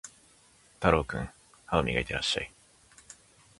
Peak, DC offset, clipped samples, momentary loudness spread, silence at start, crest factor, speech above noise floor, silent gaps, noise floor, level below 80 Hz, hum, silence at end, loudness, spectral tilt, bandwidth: -6 dBFS; under 0.1%; under 0.1%; 24 LU; 0.05 s; 26 dB; 32 dB; none; -61 dBFS; -46 dBFS; none; 0.45 s; -29 LUFS; -4.5 dB/octave; 11.5 kHz